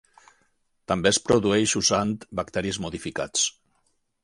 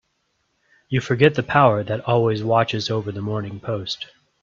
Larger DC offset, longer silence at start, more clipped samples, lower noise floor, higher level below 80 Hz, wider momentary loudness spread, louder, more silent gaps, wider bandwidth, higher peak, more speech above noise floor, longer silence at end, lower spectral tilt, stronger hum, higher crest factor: neither; about the same, 0.9 s vs 0.9 s; neither; about the same, -70 dBFS vs -70 dBFS; about the same, -52 dBFS vs -56 dBFS; about the same, 10 LU vs 11 LU; second, -24 LUFS vs -21 LUFS; neither; first, 11.5 kHz vs 7.6 kHz; second, -4 dBFS vs 0 dBFS; second, 46 dB vs 50 dB; first, 0.75 s vs 0.35 s; second, -3 dB/octave vs -6.5 dB/octave; neither; about the same, 22 dB vs 20 dB